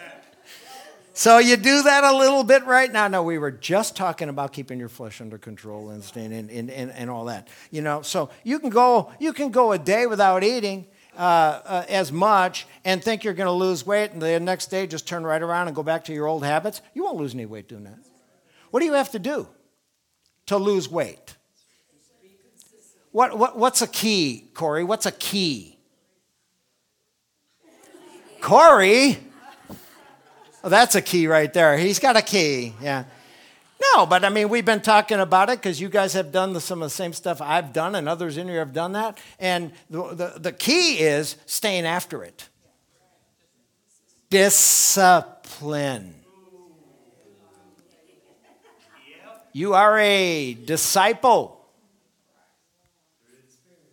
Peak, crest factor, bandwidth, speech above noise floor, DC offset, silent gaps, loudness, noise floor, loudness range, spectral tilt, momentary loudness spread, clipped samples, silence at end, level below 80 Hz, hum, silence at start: 0 dBFS; 22 dB; 19.5 kHz; 52 dB; under 0.1%; none; -20 LUFS; -72 dBFS; 11 LU; -3 dB/octave; 18 LU; under 0.1%; 2.45 s; -70 dBFS; none; 0 s